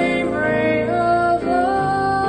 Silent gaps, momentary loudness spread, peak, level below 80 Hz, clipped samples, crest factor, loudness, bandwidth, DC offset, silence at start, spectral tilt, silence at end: none; 2 LU; -6 dBFS; -44 dBFS; under 0.1%; 12 dB; -18 LUFS; 9.4 kHz; under 0.1%; 0 s; -6.5 dB/octave; 0 s